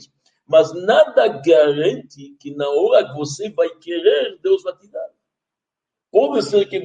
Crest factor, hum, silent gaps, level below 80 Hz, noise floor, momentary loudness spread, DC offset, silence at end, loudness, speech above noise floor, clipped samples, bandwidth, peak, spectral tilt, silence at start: 16 dB; none; none; -70 dBFS; -85 dBFS; 18 LU; under 0.1%; 0 s; -17 LUFS; 68 dB; under 0.1%; 9.2 kHz; -2 dBFS; -5 dB/octave; 0.5 s